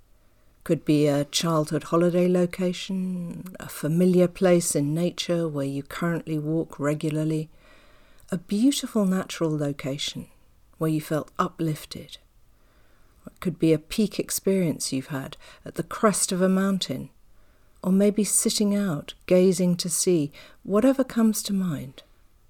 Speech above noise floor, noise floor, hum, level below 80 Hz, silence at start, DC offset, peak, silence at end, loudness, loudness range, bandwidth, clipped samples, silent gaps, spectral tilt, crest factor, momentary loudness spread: 33 dB; -57 dBFS; none; -56 dBFS; 0.65 s; under 0.1%; -8 dBFS; 0.5 s; -24 LUFS; 6 LU; 18.5 kHz; under 0.1%; none; -5 dB/octave; 16 dB; 13 LU